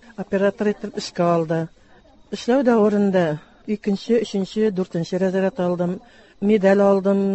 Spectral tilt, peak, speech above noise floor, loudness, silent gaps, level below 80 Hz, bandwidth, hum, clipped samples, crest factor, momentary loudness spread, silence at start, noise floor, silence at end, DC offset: -7 dB/octave; -6 dBFS; 31 dB; -20 LUFS; none; -58 dBFS; 8.4 kHz; none; under 0.1%; 14 dB; 12 LU; 0.2 s; -50 dBFS; 0 s; under 0.1%